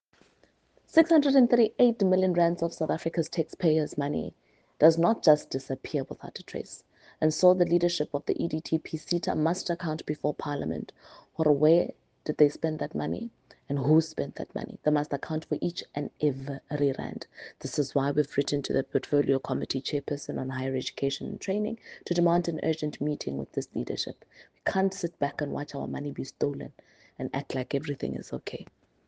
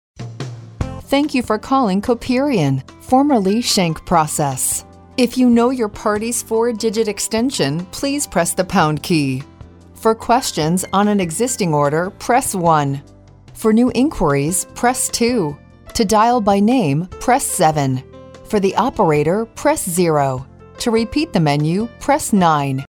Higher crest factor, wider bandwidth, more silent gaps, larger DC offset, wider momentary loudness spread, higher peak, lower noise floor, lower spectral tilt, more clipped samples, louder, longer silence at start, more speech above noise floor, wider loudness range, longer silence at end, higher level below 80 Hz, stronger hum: first, 22 dB vs 16 dB; second, 9.6 kHz vs 19 kHz; neither; neither; first, 14 LU vs 8 LU; second, -6 dBFS vs -2 dBFS; first, -65 dBFS vs -40 dBFS; about the same, -6 dB/octave vs -5 dB/octave; neither; second, -28 LUFS vs -17 LUFS; first, 0.95 s vs 0.2 s; first, 38 dB vs 24 dB; first, 6 LU vs 2 LU; first, 0.45 s vs 0.1 s; second, -66 dBFS vs -42 dBFS; neither